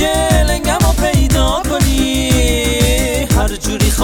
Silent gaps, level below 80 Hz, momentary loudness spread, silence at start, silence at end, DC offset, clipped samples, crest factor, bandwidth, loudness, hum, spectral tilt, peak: none; -18 dBFS; 2 LU; 0 s; 0 s; under 0.1%; under 0.1%; 12 dB; 18.5 kHz; -14 LUFS; none; -4.5 dB/octave; 0 dBFS